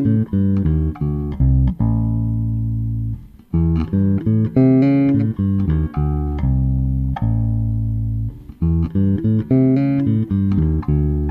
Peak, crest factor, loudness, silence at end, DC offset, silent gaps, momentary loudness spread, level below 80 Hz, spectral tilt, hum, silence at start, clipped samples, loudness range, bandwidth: -4 dBFS; 14 dB; -18 LUFS; 0 s; under 0.1%; none; 8 LU; -26 dBFS; -12 dB/octave; none; 0 s; under 0.1%; 3 LU; 4.4 kHz